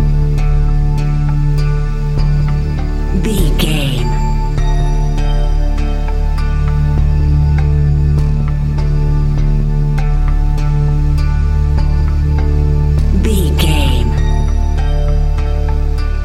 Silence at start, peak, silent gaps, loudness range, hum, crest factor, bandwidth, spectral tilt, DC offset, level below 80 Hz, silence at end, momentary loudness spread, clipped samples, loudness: 0 s; 0 dBFS; none; 2 LU; none; 12 dB; 13 kHz; -7 dB/octave; under 0.1%; -12 dBFS; 0 s; 4 LU; under 0.1%; -15 LUFS